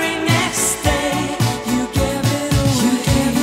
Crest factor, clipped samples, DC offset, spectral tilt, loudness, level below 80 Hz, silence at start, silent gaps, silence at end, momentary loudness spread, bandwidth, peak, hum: 16 dB; under 0.1%; under 0.1%; -4.5 dB/octave; -17 LUFS; -30 dBFS; 0 s; none; 0 s; 4 LU; 16.5 kHz; 0 dBFS; none